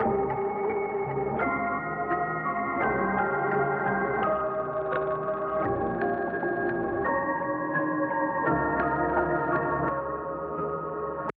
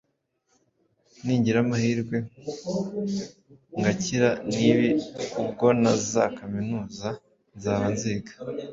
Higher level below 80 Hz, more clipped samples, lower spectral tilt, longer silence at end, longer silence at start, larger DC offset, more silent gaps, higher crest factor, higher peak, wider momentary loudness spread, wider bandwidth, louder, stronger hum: first, -52 dBFS vs -58 dBFS; neither; about the same, -6.5 dB/octave vs -5.5 dB/octave; about the same, 0.05 s vs 0 s; second, 0 s vs 1.25 s; neither; neither; second, 14 dB vs 22 dB; second, -12 dBFS vs -4 dBFS; second, 4 LU vs 14 LU; second, 4.4 kHz vs 7.8 kHz; about the same, -28 LUFS vs -26 LUFS; neither